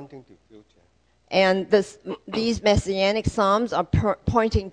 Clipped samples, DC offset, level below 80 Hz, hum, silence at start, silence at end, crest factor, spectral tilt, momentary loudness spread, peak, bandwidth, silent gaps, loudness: under 0.1%; under 0.1%; -38 dBFS; none; 0 s; 0 s; 18 dB; -5.5 dB/octave; 6 LU; -6 dBFS; 10 kHz; none; -22 LUFS